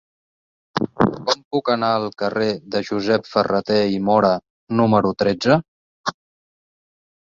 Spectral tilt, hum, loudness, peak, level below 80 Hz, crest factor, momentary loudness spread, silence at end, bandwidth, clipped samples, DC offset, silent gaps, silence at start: -6 dB/octave; none; -20 LUFS; 0 dBFS; -54 dBFS; 20 dB; 9 LU; 1.3 s; 7.6 kHz; under 0.1%; under 0.1%; 1.45-1.51 s, 4.50-4.67 s, 5.68-6.04 s; 0.75 s